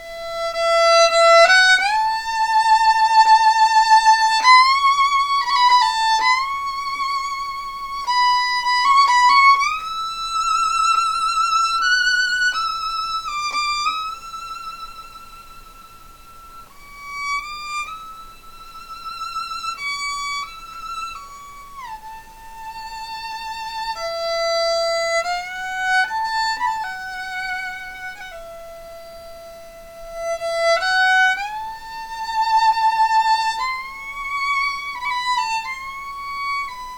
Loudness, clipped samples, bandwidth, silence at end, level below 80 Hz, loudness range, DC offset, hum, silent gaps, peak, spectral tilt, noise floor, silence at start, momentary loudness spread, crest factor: -17 LUFS; under 0.1%; 18 kHz; 0 s; -48 dBFS; 17 LU; 0.2%; none; none; -2 dBFS; 1 dB/octave; -43 dBFS; 0 s; 21 LU; 18 dB